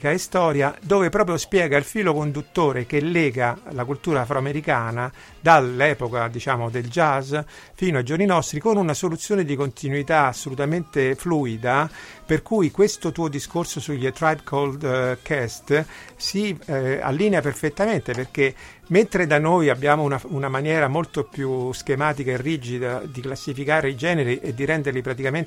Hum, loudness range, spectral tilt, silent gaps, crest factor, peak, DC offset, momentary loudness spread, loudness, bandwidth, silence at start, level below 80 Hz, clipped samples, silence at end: none; 3 LU; -5.5 dB/octave; none; 22 dB; 0 dBFS; under 0.1%; 8 LU; -22 LUFS; 16 kHz; 0 s; -50 dBFS; under 0.1%; 0 s